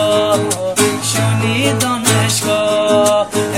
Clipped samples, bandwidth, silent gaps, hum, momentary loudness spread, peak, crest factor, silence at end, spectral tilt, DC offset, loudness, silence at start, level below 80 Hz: under 0.1%; 17 kHz; none; none; 3 LU; 0 dBFS; 14 dB; 0 s; -4 dB/octave; 0.3%; -14 LUFS; 0 s; -52 dBFS